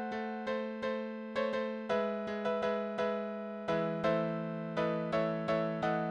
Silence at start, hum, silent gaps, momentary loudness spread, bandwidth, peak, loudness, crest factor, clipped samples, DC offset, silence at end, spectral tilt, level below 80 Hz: 0 s; none; none; 6 LU; 9.2 kHz; -18 dBFS; -35 LUFS; 16 dB; under 0.1%; under 0.1%; 0 s; -7 dB/octave; -68 dBFS